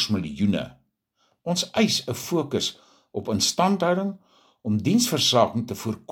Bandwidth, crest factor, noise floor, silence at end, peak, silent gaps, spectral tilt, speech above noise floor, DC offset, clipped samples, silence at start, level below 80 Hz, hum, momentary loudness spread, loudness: 17 kHz; 22 dB; -70 dBFS; 0.15 s; -4 dBFS; none; -4 dB/octave; 46 dB; under 0.1%; under 0.1%; 0 s; -60 dBFS; none; 14 LU; -23 LUFS